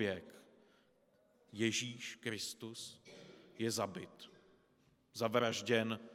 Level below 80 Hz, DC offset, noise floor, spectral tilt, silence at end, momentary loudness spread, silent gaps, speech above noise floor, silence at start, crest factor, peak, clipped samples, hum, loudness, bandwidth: -86 dBFS; under 0.1%; -73 dBFS; -3.5 dB/octave; 0 s; 22 LU; none; 33 dB; 0 s; 24 dB; -18 dBFS; under 0.1%; none; -39 LUFS; 16.5 kHz